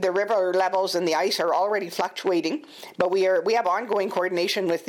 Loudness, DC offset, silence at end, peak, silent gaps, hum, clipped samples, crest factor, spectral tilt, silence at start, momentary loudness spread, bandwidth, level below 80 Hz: -24 LUFS; under 0.1%; 0 s; -6 dBFS; none; none; under 0.1%; 18 dB; -3.5 dB/octave; 0 s; 5 LU; 17.5 kHz; -76 dBFS